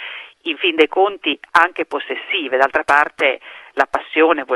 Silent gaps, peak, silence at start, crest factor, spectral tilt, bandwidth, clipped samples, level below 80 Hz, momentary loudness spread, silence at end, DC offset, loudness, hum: none; 0 dBFS; 0 s; 18 dB; -3 dB/octave; 12 kHz; under 0.1%; -60 dBFS; 11 LU; 0 s; under 0.1%; -17 LUFS; none